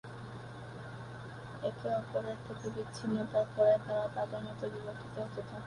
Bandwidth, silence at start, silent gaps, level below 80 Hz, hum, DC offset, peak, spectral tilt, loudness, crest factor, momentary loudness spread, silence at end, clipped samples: 11 kHz; 0.05 s; none; -64 dBFS; none; under 0.1%; -16 dBFS; -7 dB/octave; -36 LUFS; 20 dB; 17 LU; 0 s; under 0.1%